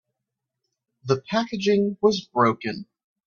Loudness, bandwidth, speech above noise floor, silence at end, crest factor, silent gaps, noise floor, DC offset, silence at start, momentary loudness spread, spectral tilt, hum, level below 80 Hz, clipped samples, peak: -23 LUFS; 7.2 kHz; 61 dB; 0.45 s; 20 dB; none; -84 dBFS; under 0.1%; 1.05 s; 11 LU; -5.5 dB/octave; none; -66 dBFS; under 0.1%; -4 dBFS